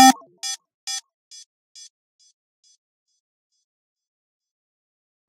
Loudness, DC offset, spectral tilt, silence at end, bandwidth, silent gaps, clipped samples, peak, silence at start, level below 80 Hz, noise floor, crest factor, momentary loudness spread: -23 LUFS; under 0.1%; 0 dB/octave; 4.3 s; 16 kHz; 0.74-0.87 s; under 0.1%; 0 dBFS; 0 s; -90 dBFS; -34 dBFS; 26 dB; 20 LU